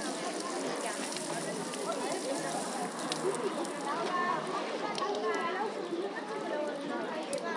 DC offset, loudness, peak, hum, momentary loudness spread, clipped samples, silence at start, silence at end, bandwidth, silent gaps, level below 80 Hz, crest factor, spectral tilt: under 0.1%; -35 LUFS; -14 dBFS; none; 4 LU; under 0.1%; 0 s; 0 s; 11.5 kHz; none; -88 dBFS; 20 dB; -3 dB/octave